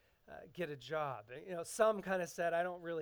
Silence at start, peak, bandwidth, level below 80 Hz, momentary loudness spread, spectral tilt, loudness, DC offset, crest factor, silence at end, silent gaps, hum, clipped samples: 0.3 s; -20 dBFS; over 20 kHz; -74 dBFS; 16 LU; -4.5 dB/octave; -39 LUFS; under 0.1%; 20 dB; 0 s; none; none; under 0.1%